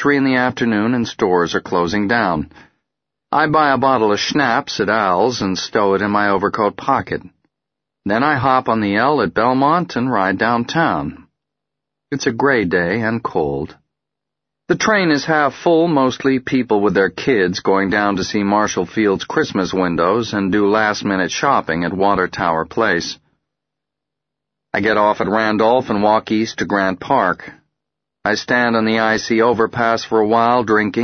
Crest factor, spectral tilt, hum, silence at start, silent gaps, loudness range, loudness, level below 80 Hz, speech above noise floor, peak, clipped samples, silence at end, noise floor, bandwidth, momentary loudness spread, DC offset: 16 dB; -5 dB/octave; none; 0 s; none; 3 LU; -16 LUFS; -50 dBFS; 66 dB; 0 dBFS; under 0.1%; 0 s; -82 dBFS; 6.6 kHz; 6 LU; under 0.1%